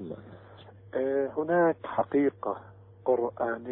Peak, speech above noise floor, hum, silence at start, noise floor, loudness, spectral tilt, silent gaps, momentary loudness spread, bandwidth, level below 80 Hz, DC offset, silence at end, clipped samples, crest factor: -14 dBFS; 23 dB; none; 0 s; -50 dBFS; -29 LUFS; -11 dB/octave; none; 17 LU; 3.9 kHz; -68 dBFS; under 0.1%; 0 s; under 0.1%; 16 dB